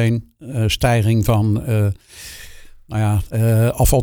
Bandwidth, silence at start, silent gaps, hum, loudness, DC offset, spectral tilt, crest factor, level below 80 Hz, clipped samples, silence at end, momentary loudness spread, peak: 19.5 kHz; 0 s; none; none; -18 LUFS; under 0.1%; -6 dB/octave; 16 dB; -30 dBFS; under 0.1%; 0 s; 17 LU; -2 dBFS